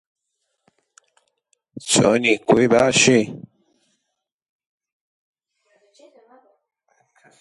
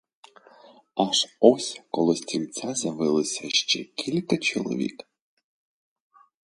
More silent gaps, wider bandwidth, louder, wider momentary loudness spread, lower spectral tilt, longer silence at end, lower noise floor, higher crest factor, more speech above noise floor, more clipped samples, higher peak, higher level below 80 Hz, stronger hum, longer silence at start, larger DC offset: neither; about the same, 11.5 kHz vs 11.5 kHz; first, -16 LUFS vs -25 LUFS; first, 17 LU vs 10 LU; about the same, -3.5 dB/octave vs -3.5 dB/octave; first, 4.05 s vs 1.55 s; first, -79 dBFS vs -53 dBFS; about the same, 22 dB vs 26 dB; first, 63 dB vs 28 dB; neither; about the same, -2 dBFS vs -2 dBFS; first, -58 dBFS vs -72 dBFS; neither; first, 1.75 s vs 0.95 s; neither